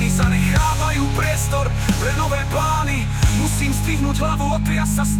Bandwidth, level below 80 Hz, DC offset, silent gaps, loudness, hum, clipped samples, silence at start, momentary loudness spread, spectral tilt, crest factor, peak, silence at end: 19 kHz; -24 dBFS; under 0.1%; none; -19 LUFS; none; under 0.1%; 0 s; 3 LU; -5 dB/octave; 12 dB; -6 dBFS; 0 s